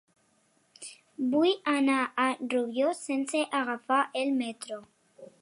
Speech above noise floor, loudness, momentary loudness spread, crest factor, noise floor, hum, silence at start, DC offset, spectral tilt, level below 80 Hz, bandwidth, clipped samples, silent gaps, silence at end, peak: 41 dB; -28 LUFS; 17 LU; 18 dB; -69 dBFS; none; 0.8 s; under 0.1%; -3 dB/octave; -84 dBFS; 11.5 kHz; under 0.1%; none; 0.15 s; -12 dBFS